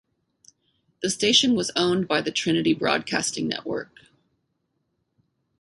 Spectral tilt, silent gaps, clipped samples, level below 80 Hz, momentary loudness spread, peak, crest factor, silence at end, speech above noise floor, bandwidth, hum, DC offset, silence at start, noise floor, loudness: -3 dB/octave; none; under 0.1%; -62 dBFS; 12 LU; -6 dBFS; 20 dB; 1.75 s; 51 dB; 11.5 kHz; none; under 0.1%; 1 s; -75 dBFS; -23 LUFS